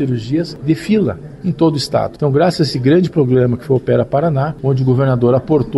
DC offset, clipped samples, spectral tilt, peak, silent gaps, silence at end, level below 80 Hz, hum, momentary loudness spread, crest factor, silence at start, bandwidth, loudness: under 0.1%; under 0.1%; -7.5 dB/octave; -2 dBFS; none; 0 s; -44 dBFS; none; 6 LU; 12 dB; 0 s; 12 kHz; -15 LUFS